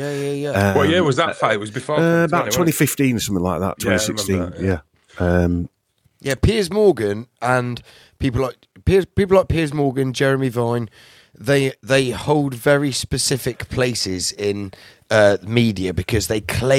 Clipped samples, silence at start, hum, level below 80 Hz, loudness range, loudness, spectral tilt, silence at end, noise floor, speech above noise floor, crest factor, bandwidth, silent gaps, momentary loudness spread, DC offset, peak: under 0.1%; 0 s; none; -38 dBFS; 3 LU; -19 LUFS; -5 dB/octave; 0 s; -56 dBFS; 38 dB; 18 dB; 17 kHz; none; 9 LU; under 0.1%; -2 dBFS